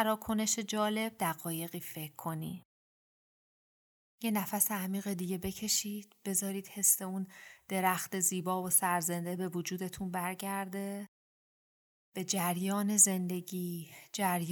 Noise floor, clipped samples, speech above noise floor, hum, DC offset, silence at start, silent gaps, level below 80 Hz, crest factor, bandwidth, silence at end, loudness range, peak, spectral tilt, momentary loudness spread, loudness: under -90 dBFS; under 0.1%; over 56 dB; none; under 0.1%; 0 s; 2.65-4.18 s, 11.08-12.12 s; -70 dBFS; 26 dB; over 20 kHz; 0 s; 7 LU; -10 dBFS; -3.5 dB/octave; 14 LU; -33 LUFS